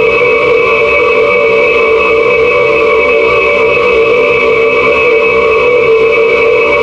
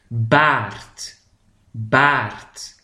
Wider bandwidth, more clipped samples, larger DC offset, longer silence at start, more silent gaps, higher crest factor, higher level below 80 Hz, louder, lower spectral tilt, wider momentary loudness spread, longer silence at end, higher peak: second, 7.8 kHz vs 13.5 kHz; neither; neither; about the same, 0 s vs 0.1 s; neither; second, 8 dB vs 20 dB; first, -36 dBFS vs -52 dBFS; first, -7 LUFS vs -17 LUFS; about the same, -5 dB/octave vs -5 dB/octave; second, 0 LU vs 20 LU; second, 0 s vs 0.15 s; about the same, 0 dBFS vs 0 dBFS